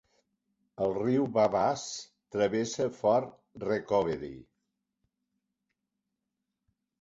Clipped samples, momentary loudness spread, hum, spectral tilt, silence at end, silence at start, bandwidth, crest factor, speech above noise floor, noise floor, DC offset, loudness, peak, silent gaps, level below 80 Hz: under 0.1%; 13 LU; none; -5.5 dB/octave; 2.6 s; 0.8 s; 8 kHz; 20 dB; 56 dB; -85 dBFS; under 0.1%; -30 LUFS; -12 dBFS; none; -66 dBFS